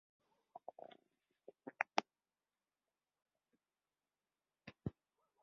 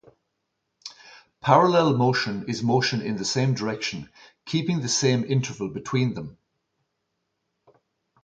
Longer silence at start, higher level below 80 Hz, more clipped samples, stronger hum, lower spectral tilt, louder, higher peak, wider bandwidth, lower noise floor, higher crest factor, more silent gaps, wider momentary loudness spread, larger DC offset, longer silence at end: second, 0.55 s vs 0.85 s; second, -76 dBFS vs -62 dBFS; neither; first, 50 Hz at -95 dBFS vs none; second, -2.5 dB/octave vs -5 dB/octave; second, -45 LUFS vs -23 LUFS; second, -16 dBFS vs -4 dBFS; second, 5.6 kHz vs 9.2 kHz; first, under -90 dBFS vs -78 dBFS; first, 36 dB vs 22 dB; neither; about the same, 22 LU vs 21 LU; neither; second, 0.5 s vs 1.9 s